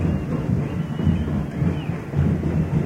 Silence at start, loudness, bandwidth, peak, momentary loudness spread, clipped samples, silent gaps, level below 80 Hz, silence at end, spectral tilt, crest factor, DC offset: 0 s; -23 LUFS; 9.2 kHz; -8 dBFS; 4 LU; under 0.1%; none; -34 dBFS; 0 s; -9 dB/octave; 14 dB; under 0.1%